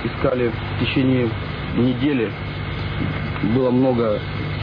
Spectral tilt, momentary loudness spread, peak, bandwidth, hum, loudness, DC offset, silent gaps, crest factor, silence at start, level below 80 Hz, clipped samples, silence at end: -9.5 dB/octave; 8 LU; -6 dBFS; 5.2 kHz; none; -21 LUFS; under 0.1%; none; 14 dB; 0 s; -36 dBFS; under 0.1%; 0 s